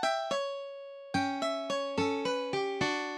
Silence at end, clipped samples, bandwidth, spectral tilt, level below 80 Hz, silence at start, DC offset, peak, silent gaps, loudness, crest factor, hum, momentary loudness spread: 0 s; under 0.1%; 12.5 kHz; -4 dB/octave; -70 dBFS; 0 s; under 0.1%; -16 dBFS; none; -33 LUFS; 16 dB; none; 8 LU